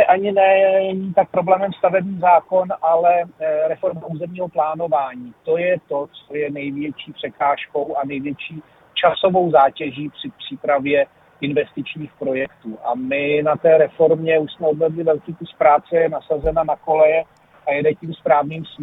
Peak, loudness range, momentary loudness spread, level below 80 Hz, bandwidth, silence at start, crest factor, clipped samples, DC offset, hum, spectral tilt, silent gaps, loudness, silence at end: -2 dBFS; 6 LU; 14 LU; -48 dBFS; 4 kHz; 0 s; 18 dB; under 0.1%; under 0.1%; none; -9 dB/octave; none; -19 LUFS; 0 s